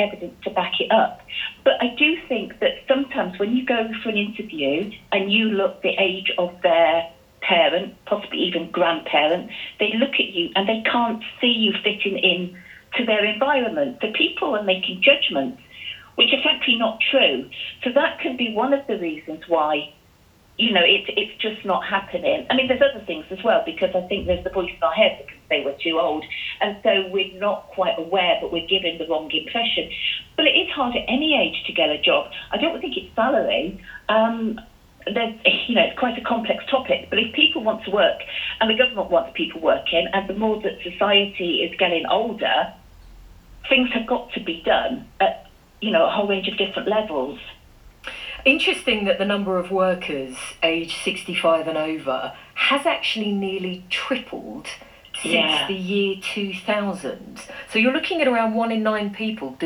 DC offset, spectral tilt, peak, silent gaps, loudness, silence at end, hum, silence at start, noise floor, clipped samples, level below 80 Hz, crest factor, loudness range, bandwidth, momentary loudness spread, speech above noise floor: under 0.1%; -4.5 dB/octave; -2 dBFS; none; -21 LUFS; 0 s; none; 0 s; -54 dBFS; under 0.1%; -52 dBFS; 20 dB; 3 LU; 19 kHz; 11 LU; 33 dB